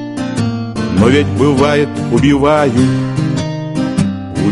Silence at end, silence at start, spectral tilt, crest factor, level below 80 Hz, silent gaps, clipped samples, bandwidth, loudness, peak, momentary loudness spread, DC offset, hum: 0 s; 0 s; -6.5 dB/octave; 12 dB; -36 dBFS; none; under 0.1%; 11.5 kHz; -13 LUFS; 0 dBFS; 8 LU; under 0.1%; none